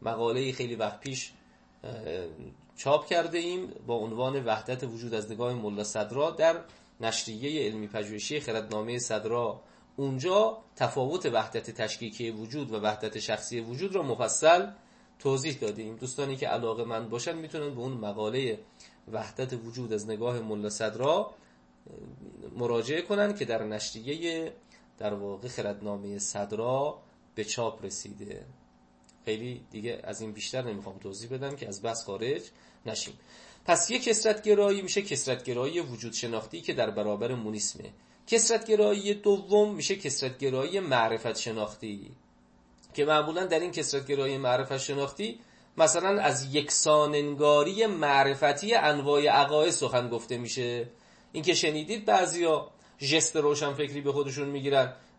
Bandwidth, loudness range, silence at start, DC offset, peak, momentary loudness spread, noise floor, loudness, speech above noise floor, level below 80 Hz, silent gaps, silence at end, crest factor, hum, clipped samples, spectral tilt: 8.8 kHz; 9 LU; 0 s; under 0.1%; -10 dBFS; 14 LU; -61 dBFS; -29 LUFS; 32 dB; -68 dBFS; none; 0.2 s; 20 dB; none; under 0.1%; -3.5 dB/octave